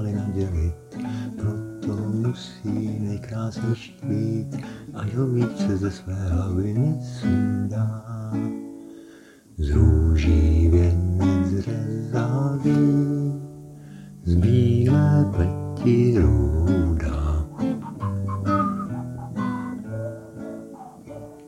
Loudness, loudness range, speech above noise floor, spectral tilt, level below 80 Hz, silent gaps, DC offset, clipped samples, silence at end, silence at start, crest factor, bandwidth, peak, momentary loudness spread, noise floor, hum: -23 LUFS; 7 LU; 27 dB; -8.5 dB/octave; -30 dBFS; none; under 0.1%; under 0.1%; 0 s; 0 s; 16 dB; 10.5 kHz; -6 dBFS; 16 LU; -48 dBFS; none